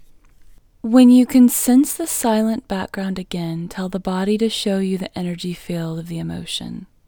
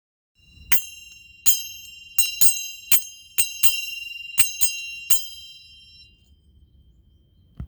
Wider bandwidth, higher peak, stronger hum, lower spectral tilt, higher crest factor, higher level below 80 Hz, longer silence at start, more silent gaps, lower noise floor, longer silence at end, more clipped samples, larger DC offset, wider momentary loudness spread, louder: about the same, over 20 kHz vs over 20 kHz; about the same, 0 dBFS vs 0 dBFS; neither; first, -5 dB/octave vs 2 dB/octave; second, 18 dB vs 24 dB; first, -50 dBFS vs -56 dBFS; first, 0.85 s vs 0.7 s; neither; second, -46 dBFS vs -57 dBFS; first, 0.25 s vs 0 s; neither; neither; about the same, 15 LU vs 17 LU; about the same, -18 LUFS vs -18 LUFS